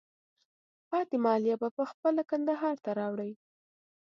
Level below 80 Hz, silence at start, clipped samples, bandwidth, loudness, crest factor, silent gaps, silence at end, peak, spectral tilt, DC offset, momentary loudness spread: -88 dBFS; 0.9 s; under 0.1%; 7.2 kHz; -31 LUFS; 18 dB; 1.71-1.77 s, 1.94-2.03 s; 0.7 s; -14 dBFS; -8 dB/octave; under 0.1%; 7 LU